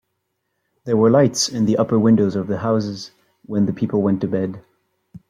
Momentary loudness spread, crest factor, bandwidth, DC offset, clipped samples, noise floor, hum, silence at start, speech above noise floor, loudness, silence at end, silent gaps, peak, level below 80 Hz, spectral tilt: 14 LU; 18 dB; 14 kHz; under 0.1%; under 0.1%; -74 dBFS; none; 0.85 s; 56 dB; -19 LUFS; 0.1 s; none; -2 dBFS; -58 dBFS; -6 dB/octave